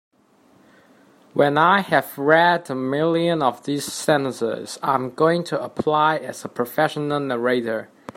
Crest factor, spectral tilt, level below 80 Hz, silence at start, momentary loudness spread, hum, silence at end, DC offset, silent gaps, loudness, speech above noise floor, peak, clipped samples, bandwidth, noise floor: 20 dB; -5 dB/octave; -66 dBFS; 1.35 s; 11 LU; none; 0.3 s; under 0.1%; none; -21 LUFS; 36 dB; -2 dBFS; under 0.1%; 16 kHz; -56 dBFS